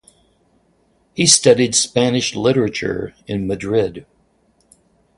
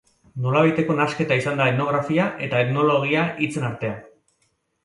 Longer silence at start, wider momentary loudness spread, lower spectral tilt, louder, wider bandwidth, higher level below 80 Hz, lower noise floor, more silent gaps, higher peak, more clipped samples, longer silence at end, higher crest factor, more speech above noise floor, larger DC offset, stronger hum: first, 1.15 s vs 0.35 s; first, 14 LU vs 10 LU; second, -3.5 dB/octave vs -7 dB/octave; first, -16 LUFS vs -21 LUFS; about the same, 11.5 kHz vs 11.5 kHz; first, -50 dBFS vs -60 dBFS; second, -60 dBFS vs -69 dBFS; neither; first, 0 dBFS vs -4 dBFS; neither; first, 1.15 s vs 0.8 s; about the same, 20 dB vs 18 dB; second, 43 dB vs 48 dB; neither; neither